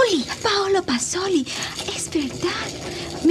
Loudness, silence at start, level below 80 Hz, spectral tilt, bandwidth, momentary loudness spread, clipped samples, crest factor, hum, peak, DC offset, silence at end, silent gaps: -23 LUFS; 0 s; -50 dBFS; -3 dB/octave; 14 kHz; 8 LU; under 0.1%; 16 dB; none; -6 dBFS; under 0.1%; 0 s; none